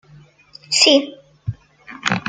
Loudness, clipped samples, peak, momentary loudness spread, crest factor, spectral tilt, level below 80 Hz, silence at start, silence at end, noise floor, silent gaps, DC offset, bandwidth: -15 LUFS; under 0.1%; 0 dBFS; 20 LU; 20 dB; -2.5 dB/octave; -52 dBFS; 0.7 s; 0 s; -48 dBFS; none; under 0.1%; 9.6 kHz